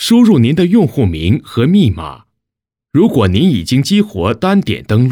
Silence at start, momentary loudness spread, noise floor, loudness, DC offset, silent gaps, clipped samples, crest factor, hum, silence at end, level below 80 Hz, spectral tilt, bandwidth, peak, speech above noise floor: 0 s; 6 LU; -81 dBFS; -12 LUFS; under 0.1%; none; under 0.1%; 10 dB; none; 0 s; -36 dBFS; -7 dB/octave; 18 kHz; -2 dBFS; 71 dB